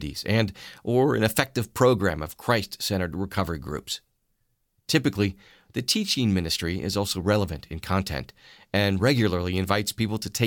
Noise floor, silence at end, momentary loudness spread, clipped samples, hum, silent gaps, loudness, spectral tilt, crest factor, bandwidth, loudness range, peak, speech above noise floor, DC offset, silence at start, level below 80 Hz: -72 dBFS; 0 s; 11 LU; under 0.1%; none; none; -25 LUFS; -5 dB/octave; 22 dB; 17.5 kHz; 4 LU; -4 dBFS; 47 dB; under 0.1%; 0 s; -48 dBFS